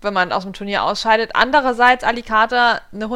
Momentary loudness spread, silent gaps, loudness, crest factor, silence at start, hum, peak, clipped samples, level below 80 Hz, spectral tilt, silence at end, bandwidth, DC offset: 8 LU; none; -16 LUFS; 16 dB; 0.05 s; none; 0 dBFS; under 0.1%; -42 dBFS; -3.5 dB/octave; 0 s; 13 kHz; under 0.1%